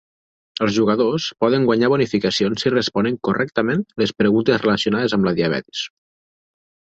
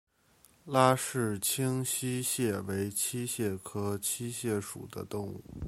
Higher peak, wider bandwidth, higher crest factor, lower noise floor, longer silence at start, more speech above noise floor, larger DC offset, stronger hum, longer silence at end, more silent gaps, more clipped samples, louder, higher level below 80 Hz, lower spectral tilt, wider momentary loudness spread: first, -2 dBFS vs -8 dBFS; second, 8 kHz vs 16.5 kHz; second, 16 dB vs 24 dB; first, under -90 dBFS vs -64 dBFS; about the same, 0.6 s vs 0.65 s; first, over 72 dB vs 32 dB; neither; neither; first, 1.05 s vs 0 s; neither; neither; first, -19 LUFS vs -32 LUFS; first, -54 dBFS vs -60 dBFS; first, -5.5 dB/octave vs -4 dB/octave; second, 6 LU vs 12 LU